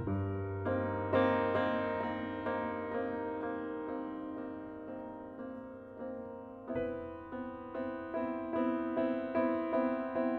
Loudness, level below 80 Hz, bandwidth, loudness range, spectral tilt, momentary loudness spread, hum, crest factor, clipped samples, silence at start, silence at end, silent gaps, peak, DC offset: -36 LUFS; -64 dBFS; 4.9 kHz; 9 LU; -9.5 dB/octave; 13 LU; none; 20 dB; under 0.1%; 0 s; 0 s; none; -16 dBFS; under 0.1%